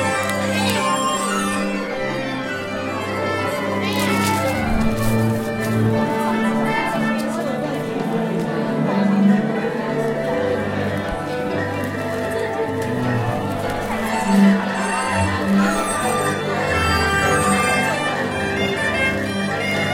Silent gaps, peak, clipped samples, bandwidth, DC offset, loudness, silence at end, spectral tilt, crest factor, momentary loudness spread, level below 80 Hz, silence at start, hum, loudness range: none; -4 dBFS; under 0.1%; 16.5 kHz; under 0.1%; -20 LUFS; 0 s; -5 dB/octave; 16 dB; 7 LU; -40 dBFS; 0 s; none; 4 LU